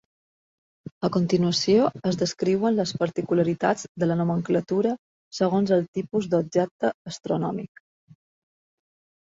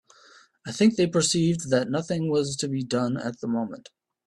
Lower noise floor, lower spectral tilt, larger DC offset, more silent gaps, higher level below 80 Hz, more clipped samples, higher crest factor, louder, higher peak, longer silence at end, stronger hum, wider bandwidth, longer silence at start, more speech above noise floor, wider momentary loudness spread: first, under -90 dBFS vs -55 dBFS; about the same, -6 dB/octave vs -5 dB/octave; neither; first, 3.88-3.95 s, 4.99-5.31 s, 5.88-5.93 s, 6.71-6.79 s, 6.94-7.05 s vs none; about the same, -64 dBFS vs -62 dBFS; neither; about the same, 16 dB vs 18 dB; about the same, -24 LUFS vs -25 LUFS; about the same, -8 dBFS vs -8 dBFS; first, 1.55 s vs 0.45 s; neither; second, 7.8 kHz vs 12 kHz; first, 1 s vs 0.65 s; first, over 66 dB vs 30 dB; second, 8 LU vs 12 LU